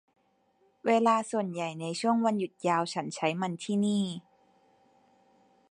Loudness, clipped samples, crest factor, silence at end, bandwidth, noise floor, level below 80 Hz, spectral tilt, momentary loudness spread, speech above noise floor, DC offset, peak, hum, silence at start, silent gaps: -29 LUFS; under 0.1%; 18 dB; 1.5 s; 11 kHz; -70 dBFS; -78 dBFS; -5.5 dB/octave; 9 LU; 41 dB; under 0.1%; -12 dBFS; none; 0.85 s; none